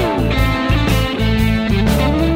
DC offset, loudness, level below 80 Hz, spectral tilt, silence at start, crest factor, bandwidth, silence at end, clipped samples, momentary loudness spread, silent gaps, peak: under 0.1%; -16 LUFS; -20 dBFS; -6.5 dB/octave; 0 s; 14 dB; 16.5 kHz; 0 s; under 0.1%; 1 LU; none; -2 dBFS